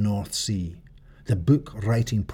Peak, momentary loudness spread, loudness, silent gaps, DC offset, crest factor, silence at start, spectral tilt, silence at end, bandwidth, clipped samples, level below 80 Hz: -8 dBFS; 10 LU; -25 LUFS; none; under 0.1%; 16 dB; 0 s; -6 dB/octave; 0 s; 16 kHz; under 0.1%; -44 dBFS